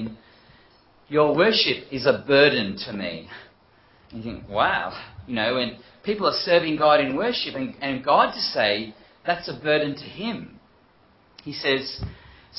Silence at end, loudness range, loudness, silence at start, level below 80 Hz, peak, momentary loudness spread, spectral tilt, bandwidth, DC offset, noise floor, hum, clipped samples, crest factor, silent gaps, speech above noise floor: 0 s; 6 LU; -22 LUFS; 0 s; -54 dBFS; -4 dBFS; 18 LU; -8 dB/octave; 5.8 kHz; under 0.1%; -57 dBFS; none; under 0.1%; 22 dB; none; 35 dB